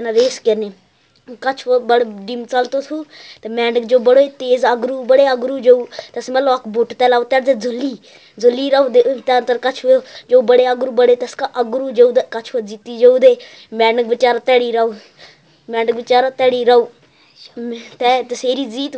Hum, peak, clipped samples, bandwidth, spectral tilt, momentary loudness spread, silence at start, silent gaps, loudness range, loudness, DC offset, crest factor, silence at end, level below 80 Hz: none; 0 dBFS; under 0.1%; 8 kHz; -3.5 dB/octave; 14 LU; 0 s; none; 3 LU; -15 LUFS; under 0.1%; 16 dB; 0 s; -74 dBFS